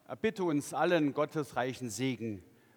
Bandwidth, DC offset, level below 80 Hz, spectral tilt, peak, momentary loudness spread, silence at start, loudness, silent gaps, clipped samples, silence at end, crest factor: 19.5 kHz; under 0.1%; -72 dBFS; -5.5 dB/octave; -16 dBFS; 10 LU; 0.1 s; -33 LUFS; none; under 0.1%; 0.35 s; 18 dB